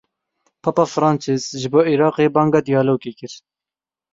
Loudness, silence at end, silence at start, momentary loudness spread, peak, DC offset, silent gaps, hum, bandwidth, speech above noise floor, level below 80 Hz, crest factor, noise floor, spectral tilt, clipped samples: -18 LUFS; 0.75 s; 0.65 s; 10 LU; -2 dBFS; under 0.1%; none; none; 7.8 kHz; 73 dB; -60 dBFS; 18 dB; -90 dBFS; -6.5 dB/octave; under 0.1%